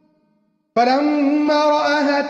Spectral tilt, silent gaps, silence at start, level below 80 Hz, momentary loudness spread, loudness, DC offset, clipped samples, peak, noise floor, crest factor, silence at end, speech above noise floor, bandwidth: -4 dB/octave; none; 0.75 s; -68 dBFS; 2 LU; -17 LUFS; under 0.1%; under 0.1%; -6 dBFS; -64 dBFS; 12 dB; 0 s; 48 dB; 7.6 kHz